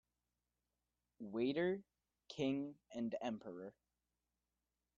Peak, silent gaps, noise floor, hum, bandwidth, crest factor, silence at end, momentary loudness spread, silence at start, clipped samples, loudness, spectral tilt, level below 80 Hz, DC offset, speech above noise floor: -28 dBFS; none; under -90 dBFS; 60 Hz at -75 dBFS; 7.4 kHz; 18 dB; 1.25 s; 15 LU; 1.2 s; under 0.1%; -43 LUFS; -5 dB/octave; -80 dBFS; under 0.1%; over 48 dB